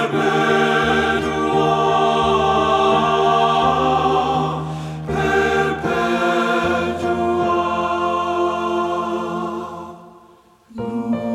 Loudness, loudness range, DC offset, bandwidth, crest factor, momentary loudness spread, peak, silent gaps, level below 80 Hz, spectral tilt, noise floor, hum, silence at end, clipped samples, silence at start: -18 LUFS; 6 LU; under 0.1%; 14 kHz; 14 dB; 10 LU; -4 dBFS; none; -42 dBFS; -5.5 dB/octave; -49 dBFS; none; 0 s; under 0.1%; 0 s